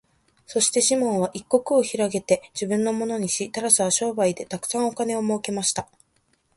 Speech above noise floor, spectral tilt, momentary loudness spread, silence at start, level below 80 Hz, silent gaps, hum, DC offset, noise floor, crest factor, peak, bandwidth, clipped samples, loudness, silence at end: 44 dB; -3 dB/octave; 7 LU; 0.5 s; -64 dBFS; none; none; under 0.1%; -67 dBFS; 20 dB; -4 dBFS; 12 kHz; under 0.1%; -23 LUFS; 0.75 s